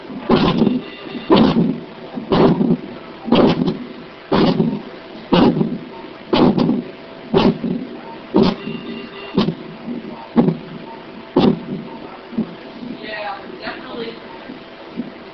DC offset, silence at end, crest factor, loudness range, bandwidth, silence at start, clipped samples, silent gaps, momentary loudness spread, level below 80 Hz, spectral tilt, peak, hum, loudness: under 0.1%; 0 s; 18 dB; 6 LU; 6.2 kHz; 0 s; under 0.1%; none; 19 LU; -44 dBFS; -5.5 dB/octave; 0 dBFS; none; -18 LUFS